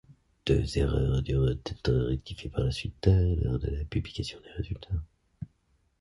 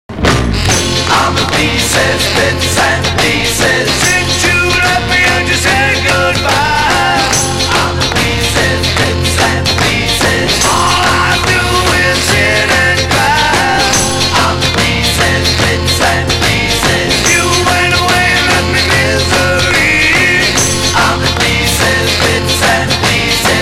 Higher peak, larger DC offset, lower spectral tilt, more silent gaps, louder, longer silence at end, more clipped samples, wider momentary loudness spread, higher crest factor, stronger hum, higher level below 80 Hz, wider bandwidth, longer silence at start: second, -10 dBFS vs 0 dBFS; neither; first, -7.5 dB/octave vs -3 dB/octave; neither; second, -30 LUFS vs -9 LUFS; first, 0.55 s vs 0 s; neither; first, 12 LU vs 2 LU; first, 18 dB vs 10 dB; neither; second, -36 dBFS vs -24 dBFS; second, 11.5 kHz vs 16.5 kHz; about the same, 0.1 s vs 0.1 s